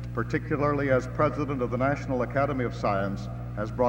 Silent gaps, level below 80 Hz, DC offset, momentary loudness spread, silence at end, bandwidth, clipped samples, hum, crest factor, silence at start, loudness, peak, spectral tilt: none; -42 dBFS; under 0.1%; 8 LU; 0 s; 8.2 kHz; under 0.1%; 60 Hz at -35 dBFS; 18 dB; 0 s; -28 LUFS; -10 dBFS; -8 dB/octave